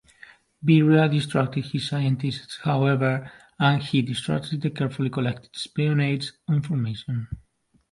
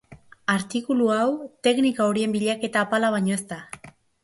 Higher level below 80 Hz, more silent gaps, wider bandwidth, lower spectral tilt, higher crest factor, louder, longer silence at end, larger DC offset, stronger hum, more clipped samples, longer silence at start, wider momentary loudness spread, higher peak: first, -56 dBFS vs -64 dBFS; neither; about the same, 11.5 kHz vs 11.5 kHz; first, -7 dB/octave vs -5 dB/octave; about the same, 18 dB vs 16 dB; about the same, -24 LUFS vs -23 LUFS; first, 0.55 s vs 0.35 s; neither; neither; neither; first, 0.6 s vs 0.1 s; about the same, 11 LU vs 12 LU; about the same, -6 dBFS vs -8 dBFS